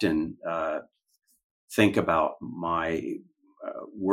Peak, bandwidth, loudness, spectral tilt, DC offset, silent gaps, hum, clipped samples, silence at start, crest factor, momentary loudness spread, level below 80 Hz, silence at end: -6 dBFS; 16 kHz; -28 LUFS; -6 dB/octave; under 0.1%; 1.44-1.68 s; none; under 0.1%; 0 s; 22 dB; 16 LU; -60 dBFS; 0 s